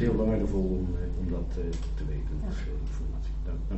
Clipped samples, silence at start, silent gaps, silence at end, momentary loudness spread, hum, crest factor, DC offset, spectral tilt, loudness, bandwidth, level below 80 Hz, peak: under 0.1%; 0 s; none; 0 s; 8 LU; none; 14 dB; under 0.1%; -8.5 dB/octave; -32 LUFS; 8.2 kHz; -32 dBFS; -14 dBFS